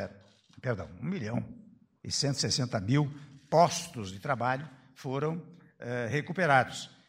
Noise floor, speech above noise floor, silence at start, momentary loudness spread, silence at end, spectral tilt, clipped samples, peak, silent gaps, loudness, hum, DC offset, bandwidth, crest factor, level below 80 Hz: -57 dBFS; 27 dB; 0 s; 17 LU; 0.2 s; -4.5 dB/octave; under 0.1%; -8 dBFS; none; -31 LUFS; none; under 0.1%; 16 kHz; 22 dB; -66 dBFS